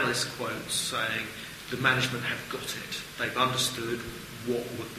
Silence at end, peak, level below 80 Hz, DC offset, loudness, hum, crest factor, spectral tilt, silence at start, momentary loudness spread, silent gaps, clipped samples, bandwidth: 0 s; -8 dBFS; -58 dBFS; under 0.1%; -30 LUFS; none; 22 dB; -3 dB/octave; 0 s; 11 LU; none; under 0.1%; 15.5 kHz